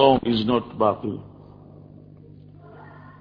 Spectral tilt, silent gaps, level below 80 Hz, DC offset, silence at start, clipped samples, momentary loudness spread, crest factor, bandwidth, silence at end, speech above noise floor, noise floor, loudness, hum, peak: -9 dB/octave; none; -52 dBFS; under 0.1%; 0 s; under 0.1%; 25 LU; 22 dB; 5.2 kHz; 0.2 s; 25 dB; -46 dBFS; -22 LUFS; 50 Hz at -50 dBFS; -2 dBFS